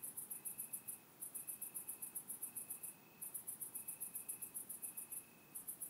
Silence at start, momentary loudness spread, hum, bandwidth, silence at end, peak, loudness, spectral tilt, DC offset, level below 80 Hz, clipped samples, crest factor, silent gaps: 0 s; 4 LU; none; 16 kHz; 0 s; -32 dBFS; -47 LUFS; -1 dB/octave; under 0.1%; under -90 dBFS; under 0.1%; 18 dB; none